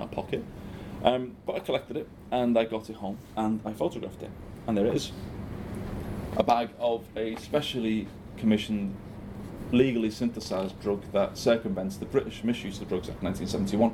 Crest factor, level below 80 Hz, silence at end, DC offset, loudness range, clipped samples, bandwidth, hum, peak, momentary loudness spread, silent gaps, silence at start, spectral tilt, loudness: 24 dB; -50 dBFS; 0 s; under 0.1%; 2 LU; under 0.1%; 15.5 kHz; none; -6 dBFS; 13 LU; none; 0 s; -6 dB/octave; -30 LUFS